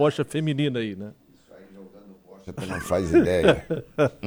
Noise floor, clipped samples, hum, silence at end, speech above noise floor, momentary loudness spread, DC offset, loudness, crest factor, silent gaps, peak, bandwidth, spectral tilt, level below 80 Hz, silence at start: -51 dBFS; under 0.1%; none; 0 s; 28 dB; 19 LU; under 0.1%; -23 LUFS; 20 dB; none; -4 dBFS; over 20 kHz; -6.5 dB/octave; -48 dBFS; 0 s